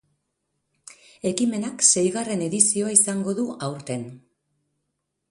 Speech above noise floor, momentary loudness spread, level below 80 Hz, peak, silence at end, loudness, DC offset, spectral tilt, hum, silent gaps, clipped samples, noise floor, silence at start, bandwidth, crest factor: 55 dB; 14 LU; -68 dBFS; 0 dBFS; 1.15 s; -21 LUFS; under 0.1%; -3.5 dB/octave; none; none; under 0.1%; -78 dBFS; 1.25 s; 11.5 kHz; 24 dB